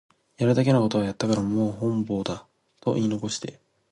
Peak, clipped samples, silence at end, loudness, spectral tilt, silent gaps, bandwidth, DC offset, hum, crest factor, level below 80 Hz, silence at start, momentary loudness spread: -8 dBFS; under 0.1%; 0.4 s; -25 LUFS; -6.5 dB/octave; none; 11.5 kHz; under 0.1%; none; 16 dB; -58 dBFS; 0.4 s; 12 LU